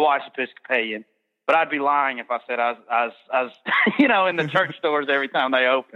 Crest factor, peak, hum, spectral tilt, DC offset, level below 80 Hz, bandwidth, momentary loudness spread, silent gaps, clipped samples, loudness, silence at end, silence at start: 16 dB; -6 dBFS; none; -6 dB/octave; under 0.1%; -78 dBFS; 8 kHz; 10 LU; none; under 0.1%; -21 LUFS; 0.15 s; 0 s